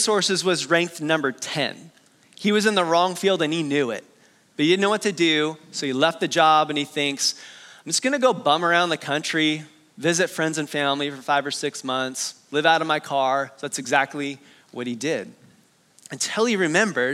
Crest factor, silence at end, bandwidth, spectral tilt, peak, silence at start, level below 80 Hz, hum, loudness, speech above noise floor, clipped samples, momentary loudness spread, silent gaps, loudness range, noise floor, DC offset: 20 dB; 0 s; 15.5 kHz; -3 dB/octave; -2 dBFS; 0 s; -80 dBFS; none; -22 LUFS; 35 dB; under 0.1%; 10 LU; none; 4 LU; -58 dBFS; under 0.1%